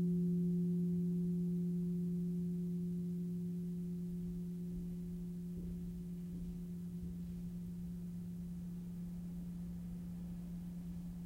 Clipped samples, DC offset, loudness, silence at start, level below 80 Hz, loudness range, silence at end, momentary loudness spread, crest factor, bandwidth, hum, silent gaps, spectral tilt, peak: under 0.1%; under 0.1%; -42 LUFS; 0 s; -56 dBFS; 8 LU; 0 s; 10 LU; 12 dB; 15 kHz; none; none; -10 dB/octave; -30 dBFS